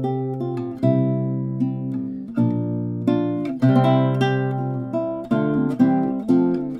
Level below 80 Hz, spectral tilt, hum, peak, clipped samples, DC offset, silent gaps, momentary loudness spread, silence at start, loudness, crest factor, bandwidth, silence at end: -58 dBFS; -9.5 dB/octave; none; -4 dBFS; under 0.1%; under 0.1%; none; 8 LU; 0 s; -21 LUFS; 16 dB; 6 kHz; 0 s